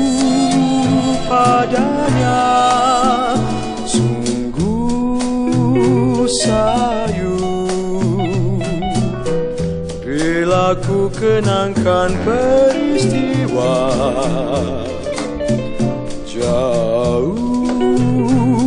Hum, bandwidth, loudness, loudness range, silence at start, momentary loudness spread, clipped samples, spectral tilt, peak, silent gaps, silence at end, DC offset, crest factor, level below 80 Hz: none; 10.5 kHz; -16 LUFS; 4 LU; 0 s; 7 LU; under 0.1%; -6 dB/octave; -2 dBFS; none; 0 s; under 0.1%; 12 dB; -32 dBFS